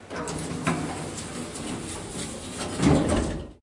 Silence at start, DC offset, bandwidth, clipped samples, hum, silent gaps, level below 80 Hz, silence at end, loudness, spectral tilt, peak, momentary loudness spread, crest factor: 0 s; under 0.1%; 11.5 kHz; under 0.1%; none; none; -42 dBFS; 0.05 s; -28 LUFS; -5 dB/octave; -8 dBFS; 12 LU; 20 dB